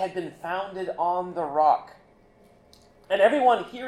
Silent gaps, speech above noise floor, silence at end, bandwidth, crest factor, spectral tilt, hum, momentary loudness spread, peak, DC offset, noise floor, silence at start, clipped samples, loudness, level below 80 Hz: none; 32 dB; 0 s; 12 kHz; 18 dB; -5.5 dB/octave; none; 12 LU; -6 dBFS; under 0.1%; -56 dBFS; 0 s; under 0.1%; -24 LUFS; -64 dBFS